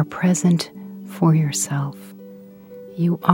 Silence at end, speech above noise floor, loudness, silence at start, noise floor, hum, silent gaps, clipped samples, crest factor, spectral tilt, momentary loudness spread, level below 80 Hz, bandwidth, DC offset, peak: 0 s; 22 dB; -20 LUFS; 0 s; -41 dBFS; none; none; under 0.1%; 20 dB; -5.5 dB/octave; 23 LU; -66 dBFS; 16.5 kHz; under 0.1%; 0 dBFS